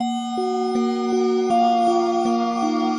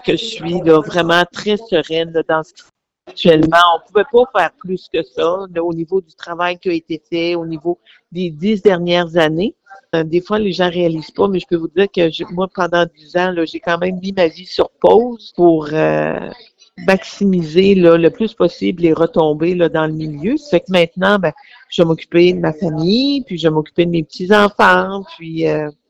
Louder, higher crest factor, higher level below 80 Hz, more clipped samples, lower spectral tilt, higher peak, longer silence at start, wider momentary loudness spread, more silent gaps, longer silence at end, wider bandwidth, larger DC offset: second, -20 LUFS vs -15 LUFS; about the same, 12 dB vs 14 dB; second, -68 dBFS vs -48 dBFS; second, under 0.1% vs 0.2%; second, -5 dB/octave vs -6.5 dB/octave; second, -8 dBFS vs 0 dBFS; about the same, 0 s vs 0.05 s; second, 5 LU vs 10 LU; neither; second, 0 s vs 0.2 s; first, 10.5 kHz vs 9.4 kHz; neither